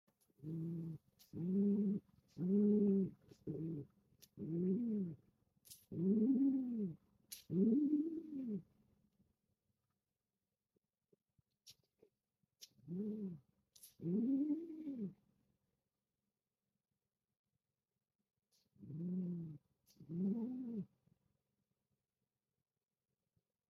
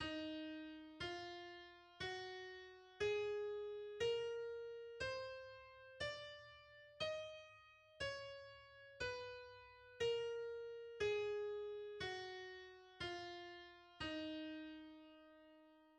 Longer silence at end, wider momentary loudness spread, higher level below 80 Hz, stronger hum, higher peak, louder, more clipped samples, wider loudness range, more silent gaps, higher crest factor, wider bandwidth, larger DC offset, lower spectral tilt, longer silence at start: first, 2.85 s vs 0 s; about the same, 20 LU vs 18 LU; second, -82 dBFS vs -74 dBFS; neither; first, -24 dBFS vs -32 dBFS; first, -41 LUFS vs -48 LUFS; neither; first, 14 LU vs 5 LU; first, 17.39-17.44 s, 18.15-18.19 s vs none; about the same, 18 dB vs 18 dB; first, 14.5 kHz vs 10 kHz; neither; first, -9.5 dB/octave vs -4 dB/octave; first, 0.4 s vs 0 s